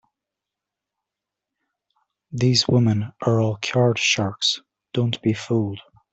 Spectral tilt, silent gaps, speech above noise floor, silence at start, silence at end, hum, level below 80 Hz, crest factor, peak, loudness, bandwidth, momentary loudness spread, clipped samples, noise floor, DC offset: -5 dB/octave; none; 65 dB; 2.3 s; 0.35 s; none; -60 dBFS; 20 dB; -4 dBFS; -21 LUFS; 8.2 kHz; 12 LU; under 0.1%; -86 dBFS; under 0.1%